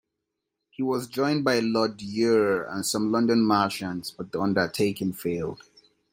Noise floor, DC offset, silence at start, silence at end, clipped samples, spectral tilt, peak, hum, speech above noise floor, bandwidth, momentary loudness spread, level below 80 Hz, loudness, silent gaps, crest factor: -83 dBFS; under 0.1%; 0.8 s; 0.6 s; under 0.1%; -5 dB/octave; -6 dBFS; none; 58 dB; 16.5 kHz; 10 LU; -64 dBFS; -25 LUFS; none; 18 dB